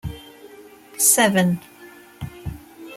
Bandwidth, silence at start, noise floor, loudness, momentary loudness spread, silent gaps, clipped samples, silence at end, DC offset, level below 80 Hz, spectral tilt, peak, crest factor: 16.5 kHz; 0.05 s; -45 dBFS; -17 LUFS; 25 LU; none; under 0.1%; 0 s; under 0.1%; -46 dBFS; -3 dB/octave; -2 dBFS; 22 dB